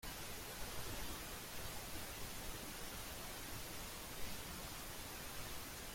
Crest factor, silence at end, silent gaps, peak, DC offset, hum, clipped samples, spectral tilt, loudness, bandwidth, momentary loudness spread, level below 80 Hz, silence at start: 16 dB; 0 s; none; -32 dBFS; under 0.1%; none; under 0.1%; -2.5 dB/octave; -48 LUFS; 16.5 kHz; 2 LU; -56 dBFS; 0 s